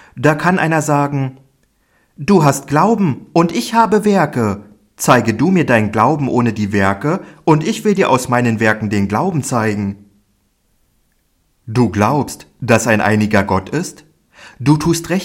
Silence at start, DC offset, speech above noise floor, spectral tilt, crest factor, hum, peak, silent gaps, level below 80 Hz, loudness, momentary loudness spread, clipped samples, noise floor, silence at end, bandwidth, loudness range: 0.15 s; under 0.1%; 47 dB; -6 dB/octave; 16 dB; none; 0 dBFS; none; -50 dBFS; -15 LUFS; 9 LU; under 0.1%; -61 dBFS; 0 s; 16.5 kHz; 5 LU